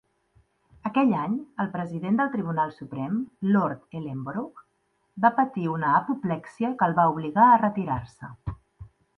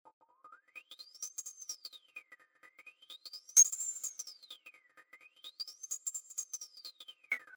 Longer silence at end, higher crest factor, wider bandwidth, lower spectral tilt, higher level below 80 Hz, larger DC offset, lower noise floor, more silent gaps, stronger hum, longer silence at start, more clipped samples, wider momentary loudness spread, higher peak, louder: first, 0.3 s vs 0 s; second, 20 dB vs 30 dB; second, 6 kHz vs over 20 kHz; first, -9 dB/octave vs 5.5 dB/octave; first, -56 dBFS vs under -90 dBFS; neither; first, -71 dBFS vs -63 dBFS; neither; neither; first, 0.85 s vs 0.45 s; neither; second, 15 LU vs 26 LU; first, -6 dBFS vs -10 dBFS; first, -25 LUFS vs -33 LUFS